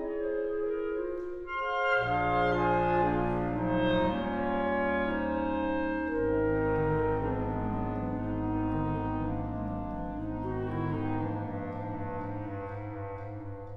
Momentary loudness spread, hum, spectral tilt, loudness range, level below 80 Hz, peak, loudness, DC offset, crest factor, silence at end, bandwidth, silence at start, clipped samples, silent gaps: 10 LU; none; -9 dB/octave; 7 LU; -46 dBFS; -16 dBFS; -31 LUFS; under 0.1%; 16 dB; 0 s; 6.8 kHz; 0 s; under 0.1%; none